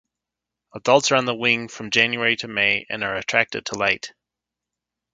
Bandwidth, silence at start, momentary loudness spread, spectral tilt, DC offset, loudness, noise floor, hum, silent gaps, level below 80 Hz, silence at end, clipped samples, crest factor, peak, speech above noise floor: 9.4 kHz; 0.75 s; 8 LU; -2.5 dB/octave; under 0.1%; -20 LUFS; -86 dBFS; 60 Hz at -55 dBFS; none; -62 dBFS; 1.05 s; under 0.1%; 22 dB; 0 dBFS; 64 dB